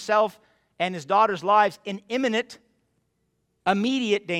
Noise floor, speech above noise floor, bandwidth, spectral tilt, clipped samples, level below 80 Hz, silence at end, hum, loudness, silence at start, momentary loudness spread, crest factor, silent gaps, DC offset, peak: -73 dBFS; 49 dB; 14 kHz; -4.5 dB/octave; under 0.1%; -70 dBFS; 0 s; none; -24 LUFS; 0 s; 9 LU; 18 dB; none; under 0.1%; -6 dBFS